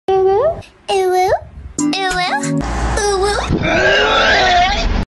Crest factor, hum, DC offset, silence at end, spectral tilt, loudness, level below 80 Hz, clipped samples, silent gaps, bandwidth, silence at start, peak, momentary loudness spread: 10 dB; none; under 0.1%; 0.05 s; -4 dB/octave; -14 LUFS; -26 dBFS; under 0.1%; none; 12.5 kHz; 0.1 s; -4 dBFS; 8 LU